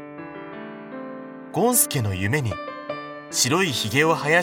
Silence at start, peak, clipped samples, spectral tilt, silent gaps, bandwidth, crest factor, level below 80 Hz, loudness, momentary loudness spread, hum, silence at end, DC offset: 0 s; -4 dBFS; under 0.1%; -3.5 dB/octave; none; 19.5 kHz; 20 dB; -60 dBFS; -22 LUFS; 18 LU; none; 0 s; under 0.1%